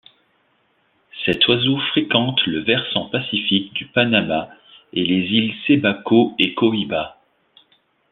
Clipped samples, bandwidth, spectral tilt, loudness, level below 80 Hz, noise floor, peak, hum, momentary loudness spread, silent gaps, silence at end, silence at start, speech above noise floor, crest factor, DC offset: under 0.1%; 4.4 kHz; -7.5 dB/octave; -18 LUFS; -58 dBFS; -63 dBFS; -2 dBFS; none; 9 LU; none; 1 s; 1.15 s; 44 dB; 18 dB; under 0.1%